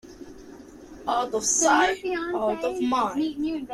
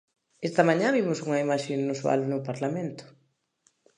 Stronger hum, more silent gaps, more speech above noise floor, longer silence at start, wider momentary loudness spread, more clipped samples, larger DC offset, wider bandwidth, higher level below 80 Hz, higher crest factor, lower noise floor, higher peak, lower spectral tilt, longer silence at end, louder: neither; neither; second, 20 dB vs 44 dB; second, 0.05 s vs 0.4 s; first, 24 LU vs 12 LU; neither; neither; first, 14.5 kHz vs 10.5 kHz; first, -56 dBFS vs -78 dBFS; about the same, 18 dB vs 22 dB; second, -45 dBFS vs -70 dBFS; about the same, -8 dBFS vs -6 dBFS; second, -2 dB/octave vs -6 dB/octave; second, 0 s vs 0.9 s; first, -24 LUFS vs -27 LUFS